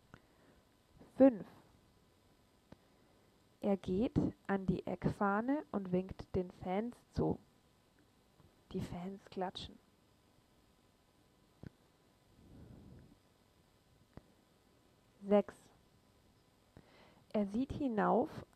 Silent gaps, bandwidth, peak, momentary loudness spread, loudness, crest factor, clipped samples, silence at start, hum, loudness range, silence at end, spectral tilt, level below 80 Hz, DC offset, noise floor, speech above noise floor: none; 13 kHz; -16 dBFS; 23 LU; -37 LUFS; 24 dB; under 0.1%; 1 s; none; 11 LU; 0.1 s; -8 dB/octave; -62 dBFS; under 0.1%; -71 dBFS; 35 dB